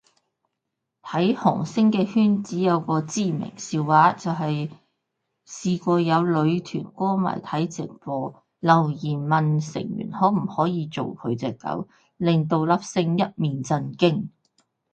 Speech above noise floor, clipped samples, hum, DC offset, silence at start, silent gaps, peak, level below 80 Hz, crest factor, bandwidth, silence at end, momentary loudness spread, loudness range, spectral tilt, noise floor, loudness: 59 dB; under 0.1%; none; under 0.1%; 1.05 s; none; -4 dBFS; -66 dBFS; 20 dB; 8.8 kHz; 0.65 s; 10 LU; 3 LU; -6.5 dB/octave; -81 dBFS; -23 LUFS